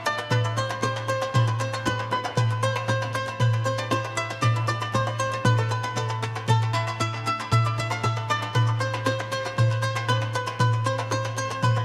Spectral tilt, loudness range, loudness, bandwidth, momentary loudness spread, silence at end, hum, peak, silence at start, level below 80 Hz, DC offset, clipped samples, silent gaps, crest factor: -5 dB/octave; 1 LU; -25 LUFS; 12.5 kHz; 4 LU; 0 s; none; -8 dBFS; 0 s; -56 dBFS; under 0.1%; under 0.1%; none; 18 dB